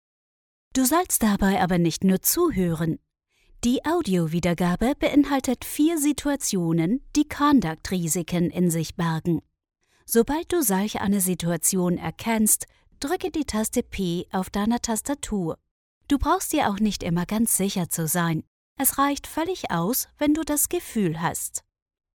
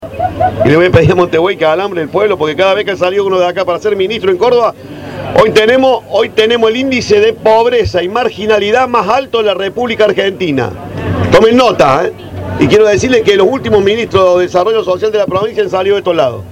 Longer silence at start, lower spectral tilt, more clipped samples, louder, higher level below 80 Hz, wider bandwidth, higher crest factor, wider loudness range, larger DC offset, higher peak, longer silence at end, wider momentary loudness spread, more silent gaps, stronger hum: first, 0.75 s vs 0 s; about the same, -4.5 dB/octave vs -5.5 dB/octave; second, under 0.1% vs 0.3%; second, -24 LUFS vs -10 LUFS; second, -46 dBFS vs -38 dBFS; first, 19.5 kHz vs 15 kHz; first, 18 dB vs 10 dB; about the same, 3 LU vs 2 LU; neither; second, -6 dBFS vs 0 dBFS; first, 0.55 s vs 0 s; about the same, 7 LU vs 7 LU; first, 15.71-16.01 s, 18.47-18.76 s vs none; neither